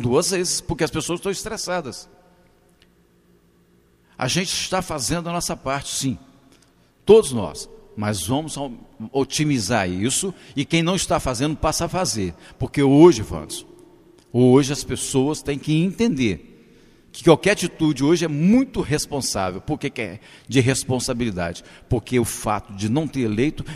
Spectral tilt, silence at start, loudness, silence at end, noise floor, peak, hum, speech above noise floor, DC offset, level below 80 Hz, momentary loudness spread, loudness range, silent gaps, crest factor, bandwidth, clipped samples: -5 dB/octave; 0 s; -21 LUFS; 0 s; -57 dBFS; 0 dBFS; none; 37 dB; under 0.1%; -44 dBFS; 14 LU; 8 LU; none; 22 dB; 15.5 kHz; under 0.1%